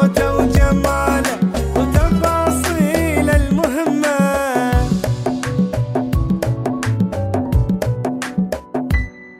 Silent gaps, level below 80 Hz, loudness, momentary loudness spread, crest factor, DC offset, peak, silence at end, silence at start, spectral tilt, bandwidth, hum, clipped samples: none; -24 dBFS; -17 LUFS; 6 LU; 16 dB; under 0.1%; 0 dBFS; 0 s; 0 s; -6.5 dB/octave; 16 kHz; none; under 0.1%